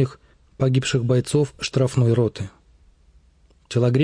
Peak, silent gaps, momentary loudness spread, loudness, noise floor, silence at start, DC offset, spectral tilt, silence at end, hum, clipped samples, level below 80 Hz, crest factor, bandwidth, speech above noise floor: -6 dBFS; none; 7 LU; -21 LUFS; -56 dBFS; 0 s; under 0.1%; -6.5 dB/octave; 0 s; none; under 0.1%; -52 dBFS; 16 dB; 10.5 kHz; 37 dB